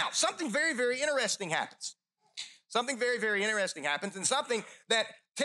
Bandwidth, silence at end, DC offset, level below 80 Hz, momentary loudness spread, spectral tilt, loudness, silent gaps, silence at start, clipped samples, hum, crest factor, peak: 12.5 kHz; 0 s; under 0.1%; under -90 dBFS; 13 LU; -1.5 dB/octave; -31 LUFS; none; 0 s; under 0.1%; none; 18 dB; -14 dBFS